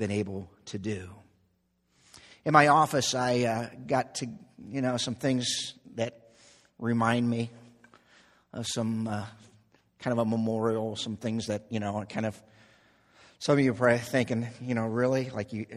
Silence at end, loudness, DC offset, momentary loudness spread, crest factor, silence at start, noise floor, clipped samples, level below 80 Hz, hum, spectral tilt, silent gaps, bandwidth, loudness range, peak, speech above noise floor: 0 s; -29 LUFS; under 0.1%; 14 LU; 26 dB; 0 s; -72 dBFS; under 0.1%; -68 dBFS; none; -5 dB/octave; none; 14 kHz; 6 LU; -4 dBFS; 44 dB